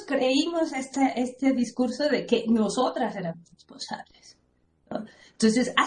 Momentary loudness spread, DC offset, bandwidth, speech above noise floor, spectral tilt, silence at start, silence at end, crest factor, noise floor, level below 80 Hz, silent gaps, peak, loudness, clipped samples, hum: 14 LU; under 0.1%; 10.5 kHz; 40 dB; -4.5 dB/octave; 0 s; 0 s; 20 dB; -66 dBFS; -64 dBFS; none; -6 dBFS; -26 LUFS; under 0.1%; none